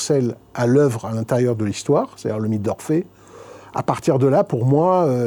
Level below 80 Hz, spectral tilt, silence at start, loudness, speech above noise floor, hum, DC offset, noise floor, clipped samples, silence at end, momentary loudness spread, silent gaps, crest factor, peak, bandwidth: -58 dBFS; -7 dB/octave; 0 s; -20 LUFS; 23 dB; none; under 0.1%; -41 dBFS; under 0.1%; 0 s; 9 LU; none; 16 dB; -4 dBFS; 19 kHz